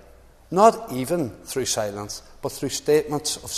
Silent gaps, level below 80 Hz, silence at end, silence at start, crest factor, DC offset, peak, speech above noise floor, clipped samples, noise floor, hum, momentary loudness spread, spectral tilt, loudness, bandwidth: none; -52 dBFS; 0 s; 0.5 s; 22 dB; under 0.1%; 0 dBFS; 27 dB; under 0.1%; -50 dBFS; none; 15 LU; -4 dB/octave; -23 LUFS; 14 kHz